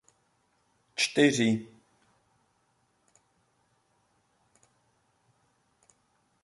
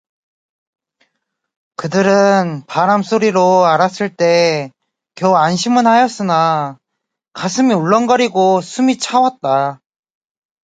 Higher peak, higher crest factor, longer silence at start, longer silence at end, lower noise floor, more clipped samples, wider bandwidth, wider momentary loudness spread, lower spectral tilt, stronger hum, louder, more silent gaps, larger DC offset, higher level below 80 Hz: second, -10 dBFS vs 0 dBFS; first, 26 dB vs 14 dB; second, 0.95 s vs 1.8 s; first, 4.8 s vs 0.9 s; second, -72 dBFS vs -77 dBFS; neither; first, 11.5 kHz vs 9.4 kHz; about the same, 11 LU vs 9 LU; about the same, -4 dB/octave vs -5 dB/octave; neither; second, -26 LUFS vs -14 LUFS; neither; neither; second, -74 dBFS vs -64 dBFS